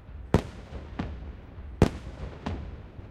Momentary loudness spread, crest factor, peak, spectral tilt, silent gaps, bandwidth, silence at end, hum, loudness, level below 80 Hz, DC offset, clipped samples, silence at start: 17 LU; 26 dB; -6 dBFS; -7.5 dB/octave; none; 15.5 kHz; 0 s; none; -31 LUFS; -40 dBFS; under 0.1%; under 0.1%; 0 s